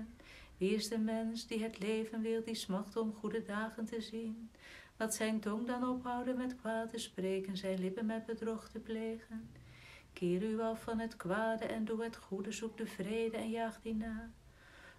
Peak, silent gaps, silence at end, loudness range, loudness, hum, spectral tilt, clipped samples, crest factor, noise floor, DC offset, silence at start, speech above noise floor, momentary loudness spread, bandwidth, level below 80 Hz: -22 dBFS; none; 0 s; 2 LU; -39 LUFS; none; -5 dB/octave; under 0.1%; 16 dB; -59 dBFS; under 0.1%; 0 s; 20 dB; 14 LU; 15 kHz; -66 dBFS